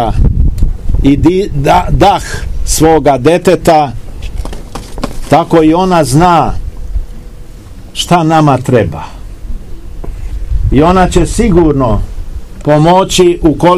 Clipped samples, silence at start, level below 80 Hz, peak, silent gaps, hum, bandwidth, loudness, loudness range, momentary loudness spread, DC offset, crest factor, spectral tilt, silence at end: 3%; 0 s; -18 dBFS; 0 dBFS; none; none; 15.5 kHz; -9 LUFS; 4 LU; 19 LU; under 0.1%; 10 dB; -6 dB/octave; 0 s